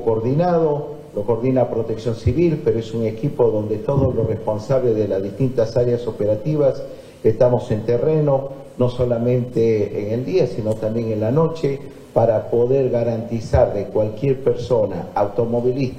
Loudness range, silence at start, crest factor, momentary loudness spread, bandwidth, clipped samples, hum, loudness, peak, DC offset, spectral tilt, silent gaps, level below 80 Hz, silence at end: 1 LU; 0 s; 16 dB; 6 LU; 9.4 kHz; under 0.1%; none; -20 LUFS; -2 dBFS; under 0.1%; -9 dB/octave; none; -42 dBFS; 0 s